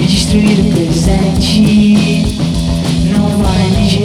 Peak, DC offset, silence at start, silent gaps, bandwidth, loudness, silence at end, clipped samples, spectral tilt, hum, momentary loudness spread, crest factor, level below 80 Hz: 0 dBFS; under 0.1%; 0 s; none; 13.5 kHz; -11 LUFS; 0 s; under 0.1%; -6 dB/octave; none; 5 LU; 10 dB; -20 dBFS